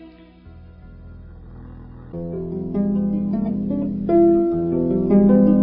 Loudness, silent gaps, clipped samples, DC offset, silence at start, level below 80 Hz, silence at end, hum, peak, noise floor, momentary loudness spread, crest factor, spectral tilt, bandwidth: -19 LUFS; none; under 0.1%; under 0.1%; 0 s; -42 dBFS; 0 s; none; -4 dBFS; -44 dBFS; 26 LU; 16 dB; -14.5 dB/octave; 2.8 kHz